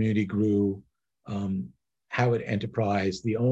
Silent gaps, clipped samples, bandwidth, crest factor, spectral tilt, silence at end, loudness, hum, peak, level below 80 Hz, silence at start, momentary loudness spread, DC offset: none; under 0.1%; 8 kHz; 18 dB; -7.5 dB/octave; 0 s; -28 LUFS; none; -10 dBFS; -54 dBFS; 0 s; 10 LU; under 0.1%